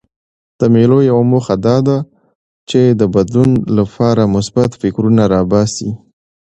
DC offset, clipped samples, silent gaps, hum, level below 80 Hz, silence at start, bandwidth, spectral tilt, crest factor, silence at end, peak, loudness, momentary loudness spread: under 0.1%; under 0.1%; 2.35-2.67 s; none; -42 dBFS; 0.6 s; 8.6 kHz; -7.5 dB/octave; 12 dB; 0.6 s; 0 dBFS; -12 LUFS; 7 LU